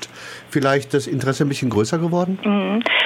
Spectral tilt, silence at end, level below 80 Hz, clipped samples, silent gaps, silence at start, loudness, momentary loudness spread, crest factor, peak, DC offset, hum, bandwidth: -5.5 dB/octave; 0 s; -60 dBFS; under 0.1%; none; 0 s; -20 LUFS; 5 LU; 14 dB; -6 dBFS; under 0.1%; none; 16 kHz